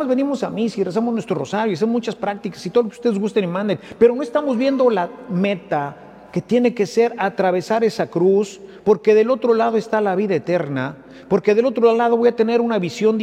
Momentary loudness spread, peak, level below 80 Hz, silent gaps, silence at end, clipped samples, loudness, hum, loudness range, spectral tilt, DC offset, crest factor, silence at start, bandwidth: 9 LU; -2 dBFS; -62 dBFS; none; 0 s; under 0.1%; -19 LUFS; none; 3 LU; -6.5 dB/octave; under 0.1%; 16 dB; 0 s; 9.8 kHz